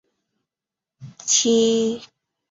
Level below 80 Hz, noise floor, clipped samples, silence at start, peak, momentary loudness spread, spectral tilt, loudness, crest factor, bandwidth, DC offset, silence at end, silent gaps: -68 dBFS; -88 dBFS; under 0.1%; 1 s; -6 dBFS; 15 LU; -2.5 dB/octave; -18 LUFS; 18 dB; 7.8 kHz; under 0.1%; 0.45 s; none